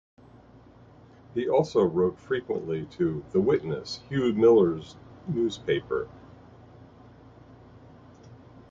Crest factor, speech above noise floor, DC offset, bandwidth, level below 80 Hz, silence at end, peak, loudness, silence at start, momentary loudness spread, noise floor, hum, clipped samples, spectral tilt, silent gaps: 18 dB; 27 dB; under 0.1%; 7.6 kHz; -58 dBFS; 0.35 s; -10 dBFS; -26 LUFS; 1.35 s; 13 LU; -52 dBFS; none; under 0.1%; -7 dB/octave; none